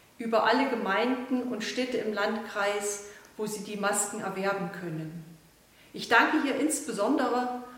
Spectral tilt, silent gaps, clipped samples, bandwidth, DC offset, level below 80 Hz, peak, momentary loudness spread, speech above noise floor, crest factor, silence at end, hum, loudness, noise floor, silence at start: -3.5 dB/octave; none; under 0.1%; 16.5 kHz; under 0.1%; -70 dBFS; -6 dBFS; 13 LU; 29 dB; 24 dB; 0 s; none; -28 LUFS; -58 dBFS; 0.2 s